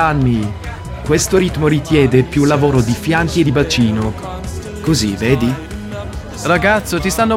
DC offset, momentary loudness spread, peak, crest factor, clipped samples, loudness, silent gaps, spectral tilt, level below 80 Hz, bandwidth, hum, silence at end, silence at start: under 0.1%; 13 LU; 0 dBFS; 14 dB; under 0.1%; -15 LUFS; none; -5.5 dB/octave; -30 dBFS; 16.5 kHz; none; 0 s; 0 s